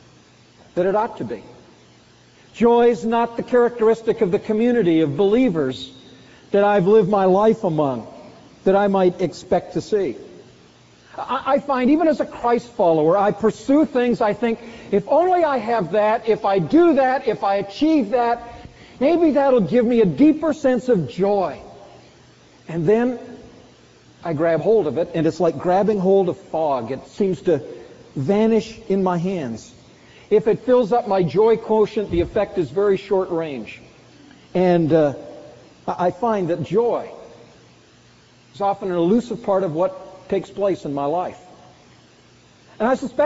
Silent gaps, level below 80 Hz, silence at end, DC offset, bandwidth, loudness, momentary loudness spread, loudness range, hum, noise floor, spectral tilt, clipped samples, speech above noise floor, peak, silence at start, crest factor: none; -52 dBFS; 0 s; under 0.1%; 8 kHz; -19 LUFS; 11 LU; 5 LU; none; -51 dBFS; -6 dB/octave; under 0.1%; 33 dB; -4 dBFS; 0.75 s; 16 dB